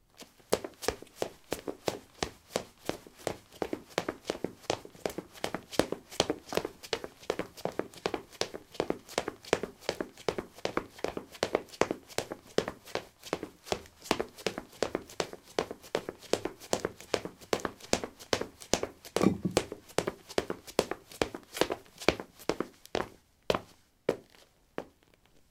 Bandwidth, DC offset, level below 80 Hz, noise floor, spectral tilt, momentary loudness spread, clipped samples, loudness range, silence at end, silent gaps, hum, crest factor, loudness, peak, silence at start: 17.5 kHz; under 0.1%; -60 dBFS; -64 dBFS; -3.5 dB/octave; 7 LU; under 0.1%; 5 LU; 0.65 s; none; none; 34 dB; -36 LUFS; -2 dBFS; 0.2 s